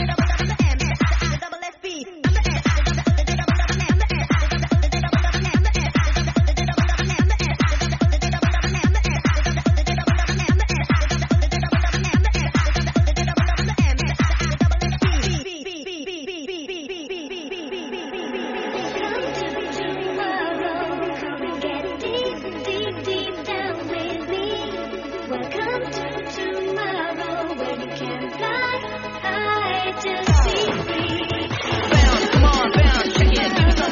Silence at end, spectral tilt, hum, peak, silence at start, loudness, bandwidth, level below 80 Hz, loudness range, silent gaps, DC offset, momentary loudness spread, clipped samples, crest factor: 0 s; -4.5 dB/octave; none; -2 dBFS; 0 s; -21 LUFS; 7.2 kHz; -24 dBFS; 6 LU; none; under 0.1%; 12 LU; under 0.1%; 18 dB